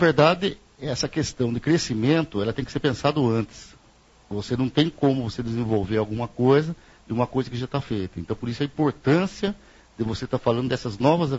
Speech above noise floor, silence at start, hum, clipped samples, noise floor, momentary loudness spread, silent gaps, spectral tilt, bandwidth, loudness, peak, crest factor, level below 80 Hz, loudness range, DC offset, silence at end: 32 dB; 0 s; none; under 0.1%; -55 dBFS; 11 LU; none; -6.5 dB/octave; 8 kHz; -24 LUFS; -2 dBFS; 22 dB; -50 dBFS; 2 LU; under 0.1%; 0 s